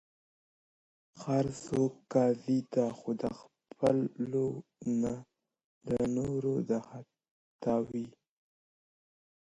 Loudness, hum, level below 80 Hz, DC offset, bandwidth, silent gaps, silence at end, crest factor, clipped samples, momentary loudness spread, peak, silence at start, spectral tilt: -33 LUFS; none; -64 dBFS; under 0.1%; 11 kHz; 5.64-5.81 s, 7.31-7.59 s; 1.45 s; 20 dB; under 0.1%; 13 LU; -14 dBFS; 1.15 s; -7.5 dB/octave